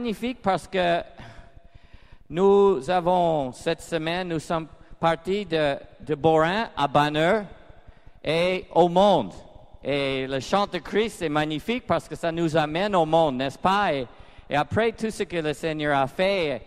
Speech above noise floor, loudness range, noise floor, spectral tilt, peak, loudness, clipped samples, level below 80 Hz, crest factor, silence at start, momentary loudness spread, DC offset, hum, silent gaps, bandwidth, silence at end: 25 dB; 2 LU; -48 dBFS; -5.5 dB/octave; -6 dBFS; -24 LUFS; under 0.1%; -50 dBFS; 18 dB; 0 s; 9 LU; under 0.1%; none; none; 14 kHz; 0 s